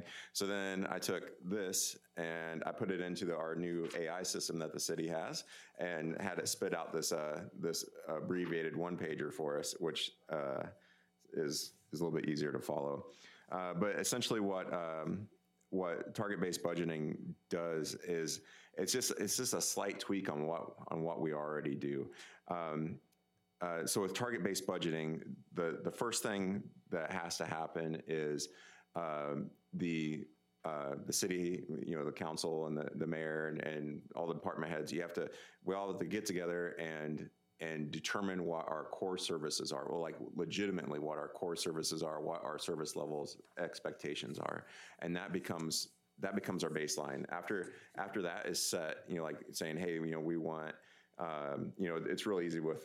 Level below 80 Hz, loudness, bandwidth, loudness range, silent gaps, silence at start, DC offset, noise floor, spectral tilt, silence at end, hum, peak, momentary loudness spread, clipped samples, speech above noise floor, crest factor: -82 dBFS; -40 LUFS; 16 kHz; 3 LU; none; 0 s; under 0.1%; -78 dBFS; -3.5 dB/octave; 0 s; none; -22 dBFS; 8 LU; under 0.1%; 38 dB; 20 dB